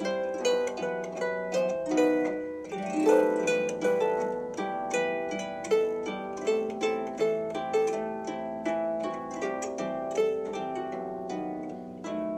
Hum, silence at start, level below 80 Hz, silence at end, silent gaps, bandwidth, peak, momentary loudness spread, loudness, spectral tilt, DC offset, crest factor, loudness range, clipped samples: none; 0 s; -68 dBFS; 0 s; none; 14 kHz; -10 dBFS; 9 LU; -30 LUFS; -4.5 dB/octave; under 0.1%; 18 dB; 5 LU; under 0.1%